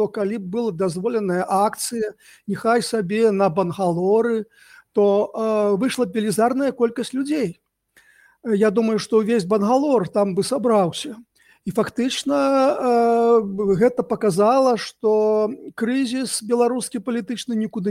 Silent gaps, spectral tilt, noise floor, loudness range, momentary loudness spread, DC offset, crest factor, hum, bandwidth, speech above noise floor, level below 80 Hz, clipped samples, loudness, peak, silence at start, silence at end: none; -5.5 dB/octave; -57 dBFS; 4 LU; 8 LU; under 0.1%; 14 dB; none; 16 kHz; 38 dB; -62 dBFS; under 0.1%; -20 LUFS; -6 dBFS; 0 s; 0 s